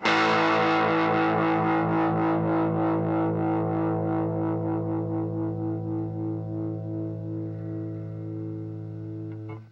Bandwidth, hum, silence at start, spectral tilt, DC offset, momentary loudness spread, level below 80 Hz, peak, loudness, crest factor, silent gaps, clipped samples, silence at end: 7.6 kHz; none; 0 s; -7.5 dB/octave; under 0.1%; 13 LU; -60 dBFS; -8 dBFS; -27 LUFS; 18 dB; none; under 0.1%; 0 s